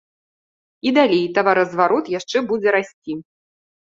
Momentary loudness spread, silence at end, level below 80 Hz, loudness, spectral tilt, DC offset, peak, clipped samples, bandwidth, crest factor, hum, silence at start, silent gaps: 14 LU; 0.65 s; -66 dBFS; -18 LUFS; -5 dB/octave; under 0.1%; -2 dBFS; under 0.1%; 7.8 kHz; 18 dB; none; 0.85 s; 2.93-3.02 s